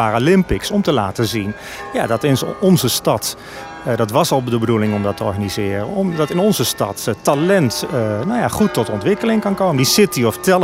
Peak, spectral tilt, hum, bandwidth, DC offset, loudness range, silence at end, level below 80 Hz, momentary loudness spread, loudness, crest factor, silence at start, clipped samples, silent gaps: -2 dBFS; -5 dB/octave; none; 16.5 kHz; under 0.1%; 2 LU; 0 s; -42 dBFS; 7 LU; -17 LUFS; 14 dB; 0 s; under 0.1%; none